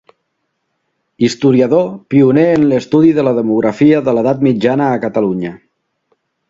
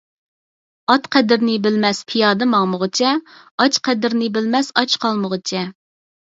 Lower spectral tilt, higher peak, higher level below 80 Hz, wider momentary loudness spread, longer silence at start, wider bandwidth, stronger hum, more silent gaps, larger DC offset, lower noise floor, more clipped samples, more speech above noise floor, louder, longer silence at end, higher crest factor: first, -7.5 dB/octave vs -4 dB/octave; about the same, 0 dBFS vs 0 dBFS; first, -54 dBFS vs -68 dBFS; about the same, 6 LU vs 8 LU; first, 1.2 s vs 0.9 s; about the same, 7.8 kHz vs 7.8 kHz; neither; second, none vs 3.51-3.58 s; neither; second, -69 dBFS vs under -90 dBFS; neither; second, 58 dB vs over 73 dB; first, -12 LUFS vs -17 LUFS; first, 0.95 s vs 0.6 s; second, 12 dB vs 18 dB